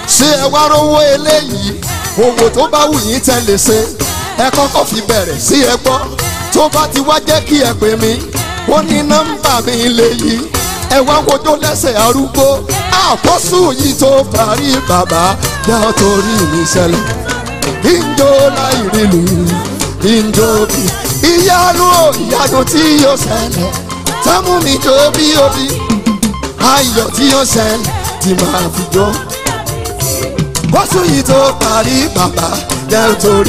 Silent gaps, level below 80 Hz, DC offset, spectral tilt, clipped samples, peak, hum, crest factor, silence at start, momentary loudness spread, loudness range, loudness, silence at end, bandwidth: none; -28 dBFS; under 0.1%; -3.5 dB/octave; under 0.1%; 0 dBFS; none; 10 dB; 0 s; 7 LU; 2 LU; -10 LUFS; 0 s; 16 kHz